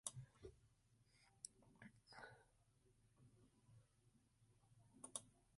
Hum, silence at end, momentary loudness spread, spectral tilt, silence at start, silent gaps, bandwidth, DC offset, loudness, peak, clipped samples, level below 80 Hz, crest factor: none; 0 s; 12 LU; -2.5 dB/octave; 0.05 s; none; 11.5 kHz; under 0.1%; -59 LUFS; -28 dBFS; under 0.1%; -82 dBFS; 36 dB